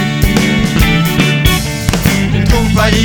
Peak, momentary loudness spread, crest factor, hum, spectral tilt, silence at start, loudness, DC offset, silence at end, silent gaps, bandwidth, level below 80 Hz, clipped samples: 0 dBFS; 2 LU; 10 dB; none; -5 dB/octave; 0 s; -11 LUFS; under 0.1%; 0 s; none; over 20 kHz; -18 dBFS; under 0.1%